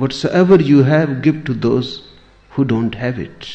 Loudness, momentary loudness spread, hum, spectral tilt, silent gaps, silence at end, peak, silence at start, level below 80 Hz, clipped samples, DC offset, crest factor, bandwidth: -15 LUFS; 16 LU; none; -7.5 dB/octave; none; 0 s; -2 dBFS; 0 s; -46 dBFS; under 0.1%; under 0.1%; 14 dB; 8.4 kHz